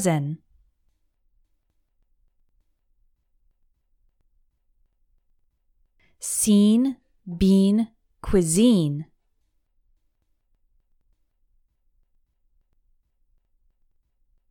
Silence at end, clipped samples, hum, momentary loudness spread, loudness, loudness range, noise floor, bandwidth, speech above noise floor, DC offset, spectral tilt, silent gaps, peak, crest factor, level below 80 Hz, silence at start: 5.5 s; under 0.1%; none; 19 LU; -21 LUFS; 12 LU; -70 dBFS; 17.5 kHz; 50 dB; under 0.1%; -5.5 dB/octave; none; -6 dBFS; 20 dB; -46 dBFS; 0 s